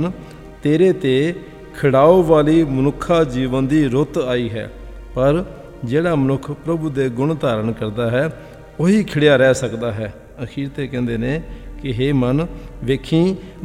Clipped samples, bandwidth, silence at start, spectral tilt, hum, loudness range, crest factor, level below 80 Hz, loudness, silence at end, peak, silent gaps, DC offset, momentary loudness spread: under 0.1%; 14.5 kHz; 0 s; -7 dB/octave; none; 5 LU; 18 dB; -38 dBFS; -18 LUFS; 0 s; 0 dBFS; none; under 0.1%; 17 LU